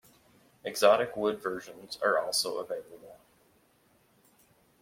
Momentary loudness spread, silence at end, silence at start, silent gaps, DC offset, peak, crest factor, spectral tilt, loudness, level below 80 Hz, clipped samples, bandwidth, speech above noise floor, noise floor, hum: 19 LU; 1.65 s; 0.65 s; none; under 0.1%; -8 dBFS; 24 dB; -2 dB/octave; -29 LUFS; -74 dBFS; under 0.1%; 16.5 kHz; 37 dB; -67 dBFS; none